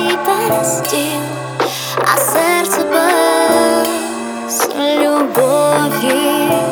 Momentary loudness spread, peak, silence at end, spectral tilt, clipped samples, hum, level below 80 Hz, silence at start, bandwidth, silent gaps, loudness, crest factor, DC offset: 7 LU; 0 dBFS; 0 s; -3 dB/octave; under 0.1%; none; -64 dBFS; 0 s; over 20 kHz; none; -14 LUFS; 14 dB; under 0.1%